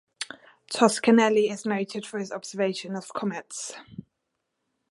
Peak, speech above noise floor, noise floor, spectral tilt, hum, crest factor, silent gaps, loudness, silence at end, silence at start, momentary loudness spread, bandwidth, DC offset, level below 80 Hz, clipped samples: -4 dBFS; 55 dB; -80 dBFS; -4 dB/octave; none; 24 dB; none; -26 LUFS; 0.9 s; 0.2 s; 18 LU; 11.5 kHz; under 0.1%; -74 dBFS; under 0.1%